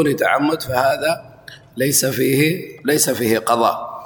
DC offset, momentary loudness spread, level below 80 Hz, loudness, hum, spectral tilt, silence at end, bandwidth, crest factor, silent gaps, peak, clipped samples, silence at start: under 0.1%; 6 LU; -54 dBFS; -17 LUFS; none; -4 dB/octave; 0 s; 19.5 kHz; 16 dB; none; -2 dBFS; under 0.1%; 0 s